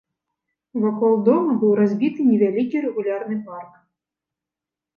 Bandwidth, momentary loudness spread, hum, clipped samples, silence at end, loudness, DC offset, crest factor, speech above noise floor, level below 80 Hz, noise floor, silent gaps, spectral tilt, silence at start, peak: 5.2 kHz; 12 LU; none; under 0.1%; 1.3 s; -20 LUFS; under 0.1%; 16 dB; 69 dB; -74 dBFS; -88 dBFS; none; -10 dB/octave; 0.75 s; -4 dBFS